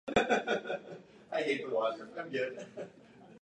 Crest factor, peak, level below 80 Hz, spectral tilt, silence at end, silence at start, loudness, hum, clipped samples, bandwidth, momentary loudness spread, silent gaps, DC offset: 22 dB; -14 dBFS; -66 dBFS; -4.5 dB/octave; 0.05 s; 0.05 s; -35 LUFS; none; under 0.1%; 10.5 kHz; 18 LU; none; under 0.1%